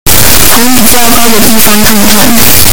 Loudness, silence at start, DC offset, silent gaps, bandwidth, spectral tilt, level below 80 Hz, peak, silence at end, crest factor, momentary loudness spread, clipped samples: -3 LUFS; 0.05 s; 50%; none; over 20 kHz; -2.5 dB/octave; -20 dBFS; 0 dBFS; 0 s; 8 dB; 2 LU; 50%